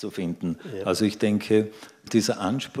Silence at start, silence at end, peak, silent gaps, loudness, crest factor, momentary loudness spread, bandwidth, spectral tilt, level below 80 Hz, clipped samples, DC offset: 0 s; 0 s; -8 dBFS; none; -25 LUFS; 16 dB; 9 LU; 15.5 kHz; -5.5 dB/octave; -64 dBFS; under 0.1%; under 0.1%